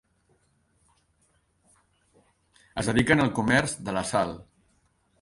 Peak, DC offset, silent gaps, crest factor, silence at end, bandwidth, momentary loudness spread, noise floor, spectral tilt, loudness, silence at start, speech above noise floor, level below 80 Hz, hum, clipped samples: -6 dBFS; under 0.1%; none; 24 dB; 0.8 s; 11.5 kHz; 11 LU; -68 dBFS; -5 dB/octave; -25 LUFS; 2.75 s; 44 dB; -52 dBFS; none; under 0.1%